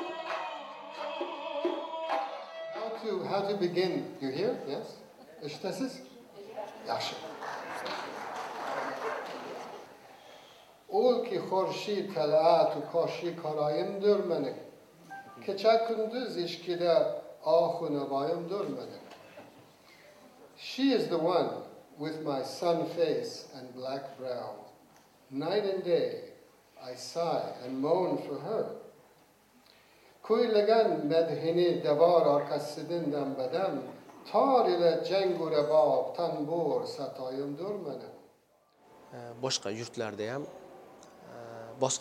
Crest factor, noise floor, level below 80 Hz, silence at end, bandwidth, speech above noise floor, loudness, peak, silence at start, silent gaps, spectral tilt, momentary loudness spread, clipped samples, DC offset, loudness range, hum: 20 dB; -67 dBFS; -82 dBFS; 0 s; 16 kHz; 37 dB; -31 LUFS; -12 dBFS; 0 s; none; -5 dB/octave; 20 LU; under 0.1%; under 0.1%; 10 LU; none